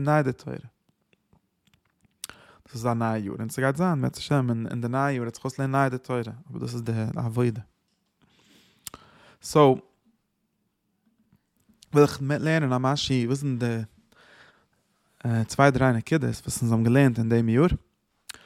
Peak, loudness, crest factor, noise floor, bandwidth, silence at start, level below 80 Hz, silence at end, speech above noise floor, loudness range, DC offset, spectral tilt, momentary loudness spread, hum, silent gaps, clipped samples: -4 dBFS; -25 LUFS; 22 dB; -75 dBFS; 15.5 kHz; 0 s; -52 dBFS; 0.7 s; 51 dB; 7 LU; under 0.1%; -6.5 dB/octave; 20 LU; none; none; under 0.1%